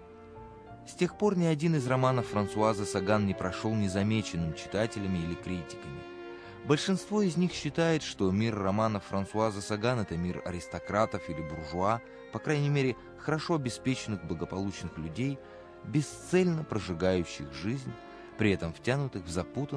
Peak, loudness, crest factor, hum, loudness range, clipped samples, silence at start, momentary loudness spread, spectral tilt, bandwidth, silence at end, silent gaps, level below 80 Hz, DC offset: -12 dBFS; -31 LUFS; 18 dB; none; 4 LU; under 0.1%; 0 s; 14 LU; -6 dB/octave; 11 kHz; 0 s; none; -56 dBFS; under 0.1%